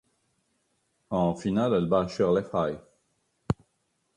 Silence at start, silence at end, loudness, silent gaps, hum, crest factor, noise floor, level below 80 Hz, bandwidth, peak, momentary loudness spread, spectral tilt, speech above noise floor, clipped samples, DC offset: 1.1 s; 0.65 s; -27 LUFS; none; none; 20 dB; -75 dBFS; -54 dBFS; 10.5 kHz; -10 dBFS; 9 LU; -7.5 dB/octave; 49 dB; under 0.1%; under 0.1%